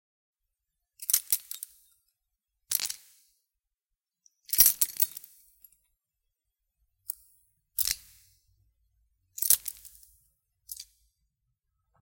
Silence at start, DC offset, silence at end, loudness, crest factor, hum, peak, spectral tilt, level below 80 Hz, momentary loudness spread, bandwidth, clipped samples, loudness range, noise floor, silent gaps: 1 s; under 0.1%; 1.2 s; -26 LUFS; 32 dB; none; -2 dBFS; 2.5 dB/octave; -64 dBFS; 24 LU; 17 kHz; under 0.1%; 10 LU; -88 dBFS; none